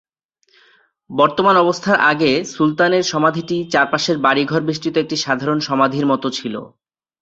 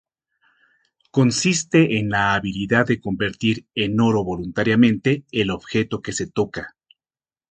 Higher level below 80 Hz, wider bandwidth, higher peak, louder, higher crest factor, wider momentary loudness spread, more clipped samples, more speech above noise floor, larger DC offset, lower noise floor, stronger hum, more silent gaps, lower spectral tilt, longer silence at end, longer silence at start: second, -60 dBFS vs -50 dBFS; second, 8 kHz vs 9.4 kHz; about the same, -2 dBFS vs -2 dBFS; first, -16 LUFS vs -20 LUFS; about the same, 16 dB vs 18 dB; about the same, 7 LU vs 8 LU; neither; second, 45 dB vs over 70 dB; neither; second, -62 dBFS vs under -90 dBFS; neither; neither; about the same, -4.5 dB/octave vs -5 dB/octave; second, 0.55 s vs 0.85 s; about the same, 1.1 s vs 1.15 s